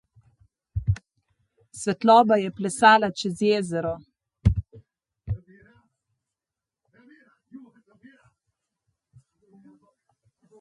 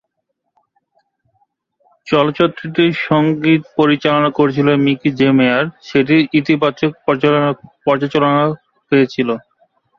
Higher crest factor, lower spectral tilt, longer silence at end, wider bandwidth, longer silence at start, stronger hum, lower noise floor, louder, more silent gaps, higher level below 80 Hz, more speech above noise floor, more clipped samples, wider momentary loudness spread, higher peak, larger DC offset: first, 22 dB vs 14 dB; second, -5.5 dB/octave vs -7.5 dB/octave; first, 3 s vs 0.6 s; first, 11.5 kHz vs 7 kHz; second, 0.75 s vs 2.05 s; neither; first, -89 dBFS vs -72 dBFS; second, -22 LUFS vs -15 LUFS; neither; first, -42 dBFS vs -56 dBFS; first, 69 dB vs 58 dB; neither; first, 18 LU vs 6 LU; second, -4 dBFS vs 0 dBFS; neither